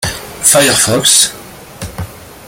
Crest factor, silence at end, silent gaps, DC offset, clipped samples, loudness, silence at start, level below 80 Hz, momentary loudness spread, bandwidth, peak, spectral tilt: 14 dB; 0 s; none; under 0.1%; 0.2%; -8 LUFS; 0 s; -40 dBFS; 21 LU; over 20 kHz; 0 dBFS; -1.5 dB/octave